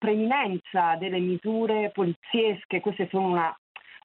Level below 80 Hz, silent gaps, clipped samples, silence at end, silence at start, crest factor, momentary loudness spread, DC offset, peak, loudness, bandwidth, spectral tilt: -76 dBFS; 2.16-2.22 s, 2.65-2.69 s, 3.58-3.75 s; under 0.1%; 0.1 s; 0 s; 14 dB; 4 LU; under 0.1%; -12 dBFS; -26 LUFS; 4.2 kHz; -9.5 dB/octave